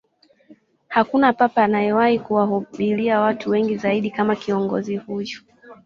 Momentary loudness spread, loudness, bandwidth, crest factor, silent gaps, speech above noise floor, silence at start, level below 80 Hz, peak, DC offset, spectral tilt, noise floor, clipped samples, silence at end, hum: 10 LU; -20 LUFS; 7.2 kHz; 18 dB; none; 33 dB; 0.5 s; -62 dBFS; -2 dBFS; under 0.1%; -7 dB/octave; -53 dBFS; under 0.1%; 0.1 s; none